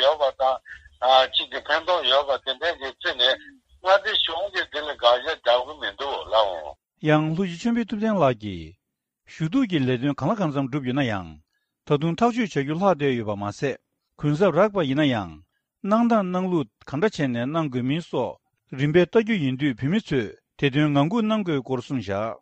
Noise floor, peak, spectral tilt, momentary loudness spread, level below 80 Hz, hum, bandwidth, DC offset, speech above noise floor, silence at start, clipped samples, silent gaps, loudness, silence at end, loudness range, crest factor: -77 dBFS; -4 dBFS; -6.5 dB/octave; 10 LU; -56 dBFS; none; 8.6 kHz; under 0.1%; 54 dB; 0 s; under 0.1%; none; -23 LUFS; 0.05 s; 3 LU; 18 dB